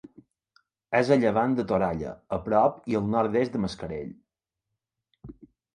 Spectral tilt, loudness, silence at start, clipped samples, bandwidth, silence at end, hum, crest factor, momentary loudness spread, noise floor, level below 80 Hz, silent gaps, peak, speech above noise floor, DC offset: -7.5 dB/octave; -26 LUFS; 0.9 s; under 0.1%; 10.5 kHz; 0.4 s; none; 20 dB; 13 LU; -85 dBFS; -54 dBFS; none; -8 dBFS; 60 dB; under 0.1%